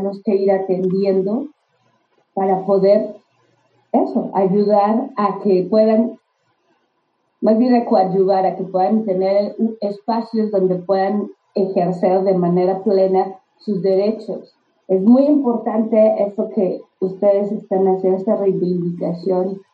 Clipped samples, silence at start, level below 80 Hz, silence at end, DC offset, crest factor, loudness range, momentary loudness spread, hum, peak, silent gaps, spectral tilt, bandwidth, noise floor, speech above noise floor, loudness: under 0.1%; 0 s; -74 dBFS; 0.15 s; under 0.1%; 14 dB; 2 LU; 8 LU; none; -2 dBFS; none; -10.5 dB/octave; 4.8 kHz; -67 dBFS; 50 dB; -17 LUFS